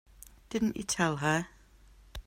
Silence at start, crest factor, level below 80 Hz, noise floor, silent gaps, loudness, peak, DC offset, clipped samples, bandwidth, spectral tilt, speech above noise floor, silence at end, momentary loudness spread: 0.5 s; 20 dB; -54 dBFS; -58 dBFS; none; -31 LUFS; -14 dBFS; under 0.1%; under 0.1%; 16 kHz; -4.5 dB/octave; 27 dB; 0.05 s; 15 LU